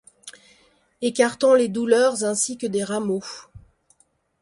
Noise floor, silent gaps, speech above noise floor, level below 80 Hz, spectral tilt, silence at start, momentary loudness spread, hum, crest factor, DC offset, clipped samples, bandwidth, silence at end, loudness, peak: -64 dBFS; none; 43 dB; -64 dBFS; -3.5 dB/octave; 0.25 s; 22 LU; none; 18 dB; under 0.1%; under 0.1%; 11.5 kHz; 0.85 s; -21 LUFS; -4 dBFS